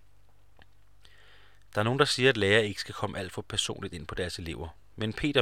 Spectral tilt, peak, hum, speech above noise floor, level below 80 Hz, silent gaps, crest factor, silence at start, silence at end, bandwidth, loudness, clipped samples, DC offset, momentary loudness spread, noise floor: -4 dB/octave; -6 dBFS; none; 34 dB; -52 dBFS; none; 24 dB; 1.75 s; 0 s; 16 kHz; -29 LUFS; under 0.1%; 0.2%; 15 LU; -63 dBFS